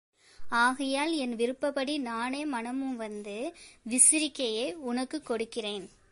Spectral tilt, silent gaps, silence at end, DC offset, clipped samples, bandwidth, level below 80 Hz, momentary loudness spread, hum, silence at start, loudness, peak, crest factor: -1 dB/octave; none; 0.25 s; under 0.1%; under 0.1%; 12 kHz; -68 dBFS; 17 LU; none; 0.4 s; -29 LUFS; -6 dBFS; 24 dB